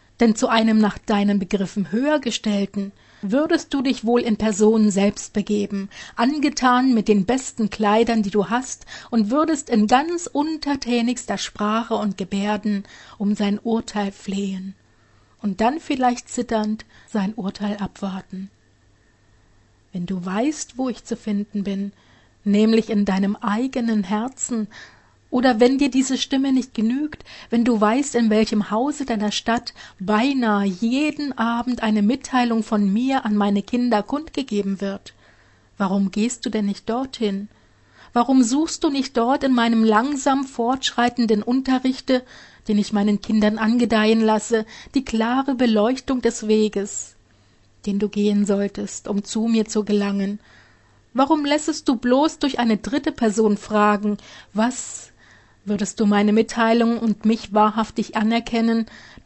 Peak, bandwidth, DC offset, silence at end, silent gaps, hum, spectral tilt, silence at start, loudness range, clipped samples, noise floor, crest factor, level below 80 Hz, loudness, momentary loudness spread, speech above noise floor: -2 dBFS; 8.4 kHz; under 0.1%; 0.2 s; none; none; -5 dB/octave; 0.2 s; 5 LU; under 0.1%; -57 dBFS; 18 dB; -52 dBFS; -21 LUFS; 10 LU; 37 dB